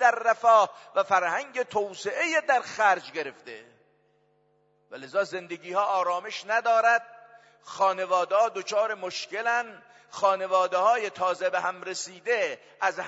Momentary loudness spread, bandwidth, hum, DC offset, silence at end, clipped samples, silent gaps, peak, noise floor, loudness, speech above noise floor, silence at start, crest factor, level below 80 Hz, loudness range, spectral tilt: 13 LU; 8 kHz; none; under 0.1%; 0 s; under 0.1%; none; -8 dBFS; -67 dBFS; -26 LUFS; 41 dB; 0 s; 20 dB; -82 dBFS; 5 LU; -2 dB/octave